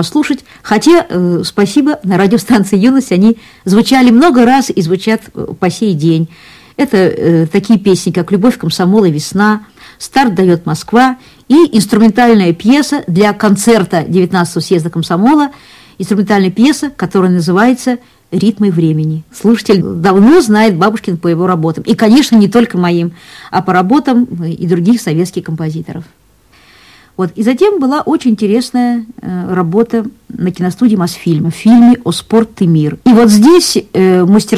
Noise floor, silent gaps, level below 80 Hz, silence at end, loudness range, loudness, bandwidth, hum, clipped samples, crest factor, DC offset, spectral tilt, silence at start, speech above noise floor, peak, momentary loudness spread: -46 dBFS; none; -46 dBFS; 0 s; 5 LU; -10 LUFS; 15.5 kHz; none; under 0.1%; 10 dB; under 0.1%; -6 dB/octave; 0 s; 36 dB; 0 dBFS; 11 LU